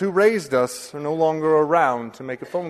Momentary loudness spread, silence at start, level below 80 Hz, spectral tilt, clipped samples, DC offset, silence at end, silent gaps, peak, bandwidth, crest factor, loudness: 12 LU; 0 s; -66 dBFS; -5.5 dB/octave; under 0.1%; under 0.1%; 0 s; none; -4 dBFS; 13.5 kHz; 16 dB; -20 LUFS